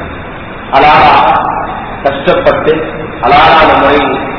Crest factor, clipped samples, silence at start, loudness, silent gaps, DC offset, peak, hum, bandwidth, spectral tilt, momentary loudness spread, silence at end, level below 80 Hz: 8 dB; 3%; 0 s; -7 LUFS; none; under 0.1%; 0 dBFS; none; 5.4 kHz; -6.5 dB/octave; 15 LU; 0 s; -30 dBFS